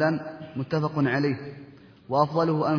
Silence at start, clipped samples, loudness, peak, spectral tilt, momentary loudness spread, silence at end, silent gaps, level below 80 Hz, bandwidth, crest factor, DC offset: 0 s; under 0.1%; -26 LUFS; -8 dBFS; -8.5 dB/octave; 13 LU; 0 s; none; -66 dBFS; 5.4 kHz; 18 dB; under 0.1%